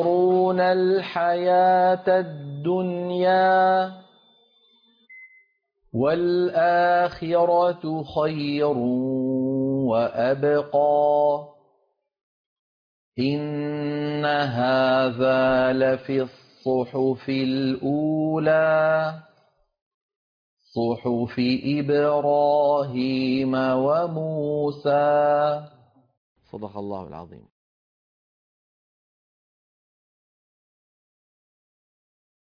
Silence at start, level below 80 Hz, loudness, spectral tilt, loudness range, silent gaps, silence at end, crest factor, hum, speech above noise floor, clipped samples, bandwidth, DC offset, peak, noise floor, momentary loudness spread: 0 s; -62 dBFS; -22 LUFS; -8.5 dB/octave; 6 LU; 12.23-13.12 s, 19.82-20.09 s, 20.16-20.57 s, 26.17-26.35 s; 5.1 s; 14 dB; none; 48 dB; under 0.1%; 5.2 kHz; under 0.1%; -10 dBFS; -70 dBFS; 10 LU